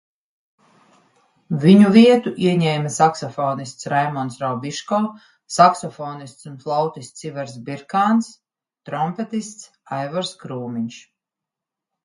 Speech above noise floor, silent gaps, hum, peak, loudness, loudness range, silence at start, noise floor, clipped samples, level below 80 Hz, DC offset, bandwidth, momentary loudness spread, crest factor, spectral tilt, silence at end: 67 dB; none; none; 0 dBFS; -19 LUFS; 10 LU; 1.5 s; -86 dBFS; under 0.1%; -66 dBFS; under 0.1%; 11.5 kHz; 19 LU; 20 dB; -6 dB/octave; 1.05 s